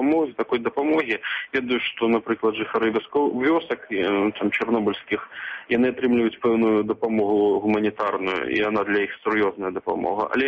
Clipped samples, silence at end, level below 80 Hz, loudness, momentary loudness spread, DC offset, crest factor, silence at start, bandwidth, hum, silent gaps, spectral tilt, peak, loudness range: under 0.1%; 0 s; -60 dBFS; -23 LUFS; 5 LU; under 0.1%; 14 dB; 0 s; 6.2 kHz; none; none; -7 dB/octave; -10 dBFS; 2 LU